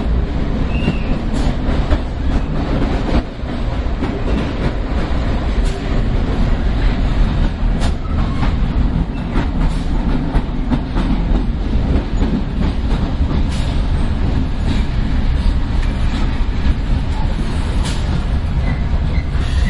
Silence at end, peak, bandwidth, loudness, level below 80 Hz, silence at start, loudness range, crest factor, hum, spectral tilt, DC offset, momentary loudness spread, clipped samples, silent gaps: 0 s; -2 dBFS; 11 kHz; -19 LUFS; -18 dBFS; 0 s; 1 LU; 14 dB; none; -7.5 dB/octave; under 0.1%; 2 LU; under 0.1%; none